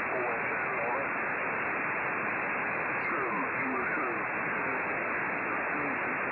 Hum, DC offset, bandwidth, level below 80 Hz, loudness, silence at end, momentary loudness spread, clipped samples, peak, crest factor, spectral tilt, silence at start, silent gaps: none; under 0.1%; 5 kHz; -68 dBFS; -31 LUFS; 0 s; 1 LU; under 0.1%; -20 dBFS; 10 dB; -9.5 dB/octave; 0 s; none